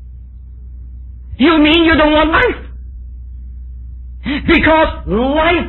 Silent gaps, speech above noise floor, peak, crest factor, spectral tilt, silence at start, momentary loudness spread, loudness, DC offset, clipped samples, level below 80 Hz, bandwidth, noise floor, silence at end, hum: none; 21 dB; 0 dBFS; 14 dB; -8 dB/octave; 0 s; 24 LU; -11 LUFS; under 0.1%; under 0.1%; -26 dBFS; 4.3 kHz; -32 dBFS; 0 s; none